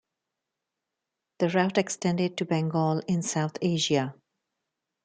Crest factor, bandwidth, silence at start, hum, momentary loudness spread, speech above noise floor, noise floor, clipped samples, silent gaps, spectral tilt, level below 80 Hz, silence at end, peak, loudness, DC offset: 20 dB; 9.4 kHz; 1.4 s; none; 4 LU; 60 dB; -86 dBFS; under 0.1%; none; -5 dB/octave; -70 dBFS; 0.9 s; -10 dBFS; -27 LUFS; under 0.1%